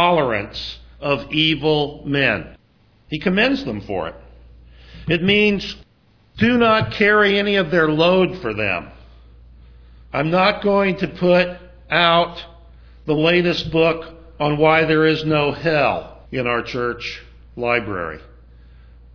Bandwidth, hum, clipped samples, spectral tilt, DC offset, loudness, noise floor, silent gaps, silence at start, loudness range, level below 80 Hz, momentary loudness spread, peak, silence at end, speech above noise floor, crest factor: 5.4 kHz; none; under 0.1%; -6.5 dB/octave; under 0.1%; -18 LUFS; -55 dBFS; none; 0 s; 5 LU; -44 dBFS; 15 LU; 0 dBFS; 0.9 s; 37 dB; 20 dB